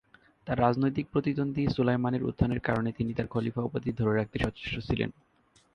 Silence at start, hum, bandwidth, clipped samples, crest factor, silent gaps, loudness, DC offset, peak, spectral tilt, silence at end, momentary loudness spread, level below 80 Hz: 0.45 s; none; 10.5 kHz; under 0.1%; 20 dB; none; -30 LUFS; under 0.1%; -10 dBFS; -8.5 dB/octave; 0.65 s; 5 LU; -48 dBFS